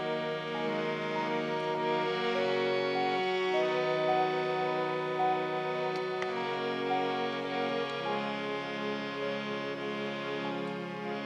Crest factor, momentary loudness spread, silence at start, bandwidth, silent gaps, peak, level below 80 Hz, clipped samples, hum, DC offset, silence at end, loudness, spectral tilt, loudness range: 14 dB; 6 LU; 0 s; 9.4 kHz; none; -18 dBFS; -84 dBFS; under 0.1%; none; under 0.1%; 0 s; -32 LUFS; -5.5 dB/octave; 4 LU